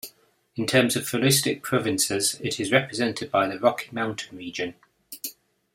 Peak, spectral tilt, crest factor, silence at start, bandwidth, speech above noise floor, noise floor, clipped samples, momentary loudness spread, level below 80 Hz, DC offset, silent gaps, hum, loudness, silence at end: -4 dBFS; -3.5 dB/octave; 22 dB; 0.05 s; 16.5 kHz; 33 dB; -58 dBFS; under 0.1%; 15 LU; -64 dBFS; under 0.1%; none; none; -24 LUFS; 0.45 s